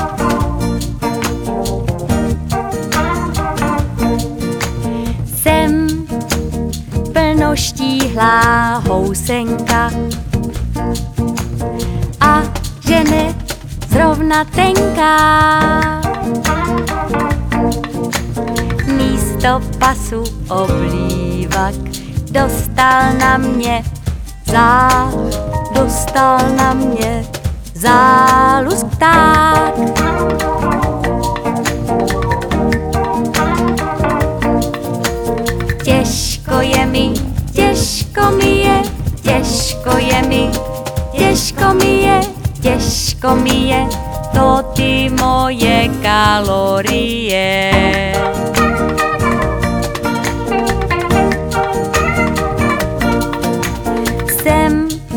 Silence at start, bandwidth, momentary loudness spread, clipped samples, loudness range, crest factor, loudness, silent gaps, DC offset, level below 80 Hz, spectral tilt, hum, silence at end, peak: 0 s; over 20 kHz; 9 LU; under 0.1%; 5 LU; 14 dB; -14 LUFS; none; under 0.1%; -24 dBFS; -5 dB/octave; none; 0 s; 0 dBFS